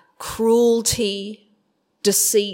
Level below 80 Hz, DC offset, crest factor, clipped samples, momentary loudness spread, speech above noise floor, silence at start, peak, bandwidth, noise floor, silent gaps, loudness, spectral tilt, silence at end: -48 dBFS; under 0.1%; 14 dB; under 0.1%; 14 LU; 49 dB; 0.2 s; -6 dBFS; 16.5 kHz; -67 dBFS; none; -18 LUFS; -3 dB/octave; 0 s